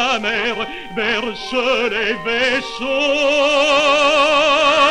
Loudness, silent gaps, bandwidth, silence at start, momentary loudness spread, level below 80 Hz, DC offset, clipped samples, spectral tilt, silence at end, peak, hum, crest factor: -16 LUFS; none; 11.5 kHz; 0 s; 8 LU; -46 dBFS; under 0.1%; under 0.1%; -2 dB/octave; 0 s; -4 dBFS; none; 14 dB